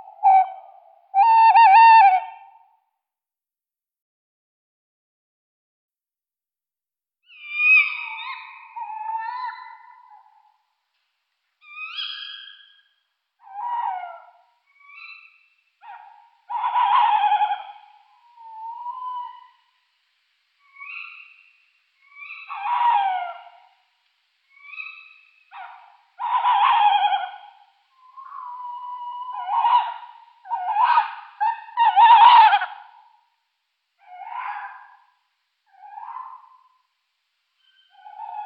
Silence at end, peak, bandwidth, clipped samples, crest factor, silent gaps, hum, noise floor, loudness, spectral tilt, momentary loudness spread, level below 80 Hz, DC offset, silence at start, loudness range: 0 s; -2 dBFS; 5.4 kHz; under 0.1%; 20 dB; 4.02-5.89 s; none; under -90 dBFS; -18 LUFS; 3 dB/octave; 27 LU; under -90 dBFS; under 0.1%; 0.05 s; 21 LU